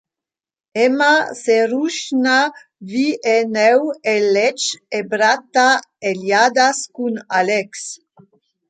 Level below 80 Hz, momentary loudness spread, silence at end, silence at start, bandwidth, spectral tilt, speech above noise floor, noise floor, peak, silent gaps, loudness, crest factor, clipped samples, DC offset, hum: -72 dBFS; 10 LU; 0.75 s; 0.75 s; 9.4 kHz; -2.5 dB/octave; 72 dB; -88 dBFS; -2 dBFS; none; -16 LUFS; 16 dB; under 0.1%; under 0.1%; none